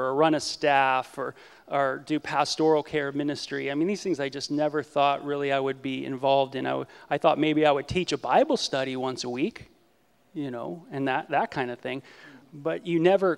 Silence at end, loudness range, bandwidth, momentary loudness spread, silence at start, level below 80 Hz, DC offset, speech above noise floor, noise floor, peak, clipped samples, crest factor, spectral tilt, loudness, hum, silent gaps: 0 s; 6 LU; 12.5 kHz; 12 LU; 0 s; -62 dBFS; under 0.1%; 39 dB; -65 dBFS; -6 dBFS; under 0.1%; 20 dB; -5 dB/octave; -26 LUFS; none; none